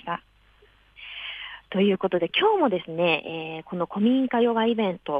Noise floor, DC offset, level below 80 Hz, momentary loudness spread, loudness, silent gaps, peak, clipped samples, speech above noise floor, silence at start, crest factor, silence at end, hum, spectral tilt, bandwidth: -58 dBFS; under 0.1%; -64 dBFS; 13 LU; -24 LUFS; none; -8 dBFS; under 0.1%; 35 dB; 0.05 s; 18 dB; 0 s; none; -8 dB/octave; 5 kHz